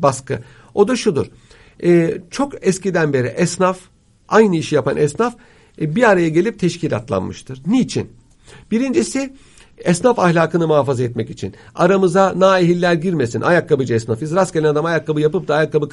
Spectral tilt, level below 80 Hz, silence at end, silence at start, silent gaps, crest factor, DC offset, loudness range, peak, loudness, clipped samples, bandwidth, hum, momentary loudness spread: -6 dB/octave; -52 dBFS; 0.05 s; 0 s; none; 16 dB; under 0.1%; 3 LU; 0 dBFS; -17 LUFS; under 0.1%; 11.5 kHz; none; 12 LU